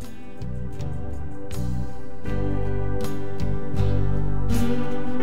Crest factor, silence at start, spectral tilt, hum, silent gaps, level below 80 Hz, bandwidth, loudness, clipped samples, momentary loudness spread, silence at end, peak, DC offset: 14 dB; 0 s; -7.5 dB/octave; none; none; -32 dBFS; 16 kHz; -28 LUFS; under 0.1%; 11 LU; 0 s; -8 dBFS; 9%